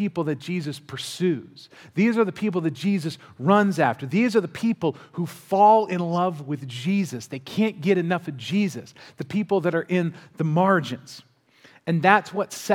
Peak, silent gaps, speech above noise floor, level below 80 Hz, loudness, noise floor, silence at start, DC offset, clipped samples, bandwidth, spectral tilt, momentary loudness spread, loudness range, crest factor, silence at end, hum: 0 dBFS; none; 32 dB; -72 dBFS; -23 LUFS; -55 dBFS; 0 s; under 0.1%; under 0.1%; 16 kHz; -6.5 dB/octave; 13 LU; 4 LU; 22 dB; 0 s; none